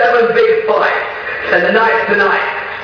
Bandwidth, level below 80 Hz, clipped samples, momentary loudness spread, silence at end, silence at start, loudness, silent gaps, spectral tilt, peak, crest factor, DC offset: 5.4 kHz; -50 dBFS; under 0.1%; 8 LU; 0 s; 0 s; -12 LUFS; none; -5.5 dB/octave; 0 dBFS; 12 dB; under 0.1%